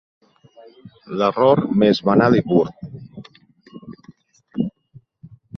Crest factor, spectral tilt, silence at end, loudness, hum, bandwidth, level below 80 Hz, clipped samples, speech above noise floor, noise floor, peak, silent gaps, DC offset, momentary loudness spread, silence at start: 18 dB; -8 dB/octave; 0 s; -18 LUFS; none; 6.4 kHz; -56 dBFS; under 0.1%; 33 dB; -50 dBFS; -2 dBFS; none; under 0.1%; 23 LU; 0.85 s